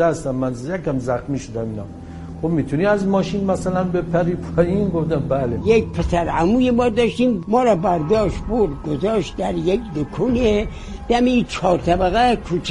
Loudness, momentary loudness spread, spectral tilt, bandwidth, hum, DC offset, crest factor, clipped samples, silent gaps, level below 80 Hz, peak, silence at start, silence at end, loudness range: -19 LUFS; 9 LU; -7 dB/octave; 11.5 kHz; none; under 0.1%; 16 dB; under 0.1%; none; -34 dBFS; -2 dBFS; 0 s; 0 s; 4 LU